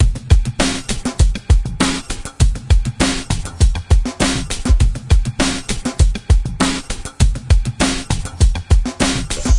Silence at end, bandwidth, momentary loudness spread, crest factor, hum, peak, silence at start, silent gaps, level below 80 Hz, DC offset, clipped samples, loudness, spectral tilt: 0 s; 11.5 kHz; 6 LU; 16 dB; none; 0 dBFS; 0 s; none; -18 dBFS; under 0.1%; under 0.1%; -18 LUFS; -4.5 dB/octave